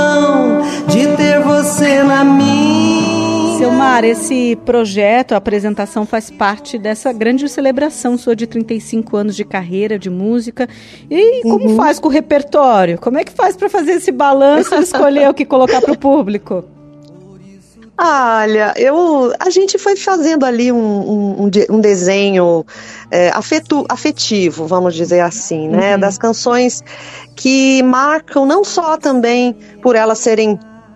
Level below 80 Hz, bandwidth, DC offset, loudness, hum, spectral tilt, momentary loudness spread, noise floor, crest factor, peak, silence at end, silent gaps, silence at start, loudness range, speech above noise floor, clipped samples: -52 dBFS; 14 kHz; under 0.1%; -12 LUFS; none; -4.5 dB/octave; 8 LU; -40 dBFS; 12 dB; 0 dBFS; 0.35 s; none; 0 s; 5 LU; 28 dB; under 0.1%